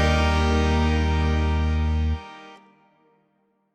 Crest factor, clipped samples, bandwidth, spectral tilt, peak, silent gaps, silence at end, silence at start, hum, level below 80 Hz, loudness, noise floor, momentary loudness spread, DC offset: 14 dB; under 0.1%; 8.8 kHz; -6.5 dB/octave; -10 dBFS; none; 1.2 s; 0 s; none; -28 dBFS; -23 LUFS; -68 dBFS; 10 LU; under 0.1%